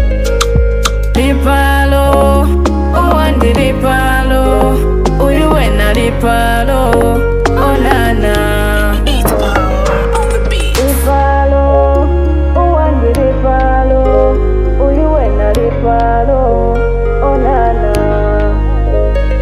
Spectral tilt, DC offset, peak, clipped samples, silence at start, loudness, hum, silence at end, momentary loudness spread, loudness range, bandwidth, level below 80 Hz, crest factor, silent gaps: -6 dB/octave; under 0.1%; 0 dBFS; 0.2%; 0 s; -11 LUFS; none; 0 s; 3 LU; 1 LU; 15.5 kHz; -12 dBFS; 10 dB; none